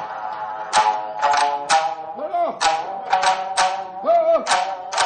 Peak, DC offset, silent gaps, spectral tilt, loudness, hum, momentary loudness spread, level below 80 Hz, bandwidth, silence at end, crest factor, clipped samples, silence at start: -6 dBFS; under 0.1%; none; -0.5 dB/octave; -20 LUFS; none; 9 LU; -62 dBFS; 9.6 kHz; 0 s; 14 dB; under 0.1%; 0 s